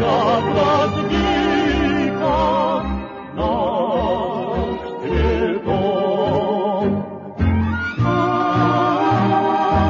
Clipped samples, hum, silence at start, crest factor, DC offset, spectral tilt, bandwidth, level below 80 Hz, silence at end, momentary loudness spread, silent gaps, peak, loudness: under 0.1%; none; 0 s; 12 dB; under 0.1%; -7.5 dB/octave; 7.4 kHz; -32 dBFS; 0 s; 6 LU; none; -4 dBFS; -19 LUFS